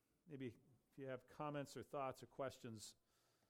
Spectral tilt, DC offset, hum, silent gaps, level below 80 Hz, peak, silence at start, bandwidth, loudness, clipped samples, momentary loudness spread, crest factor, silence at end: -5.5 dB/octave; under 0.1%; none; none; -84 dBFS; -36 dBFS; 0.25 s; 16.5 kHz; -53 LUFS; under 0.1%; 9 LU; 18 dB; 0.55 s